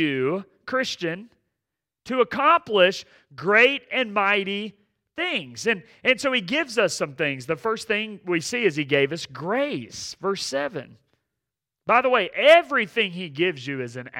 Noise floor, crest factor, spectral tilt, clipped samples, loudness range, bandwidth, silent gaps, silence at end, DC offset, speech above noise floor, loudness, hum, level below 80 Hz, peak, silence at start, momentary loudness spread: -85 dBFS; 20 dB; -4 dB/octave; under 0.1%; 5 LU; 16 kHz; none; 0 s; under 0.1%; 62 dB; -22 LUFS; none; -68 dBFS; -4 dBFS; 0 s; 14 LU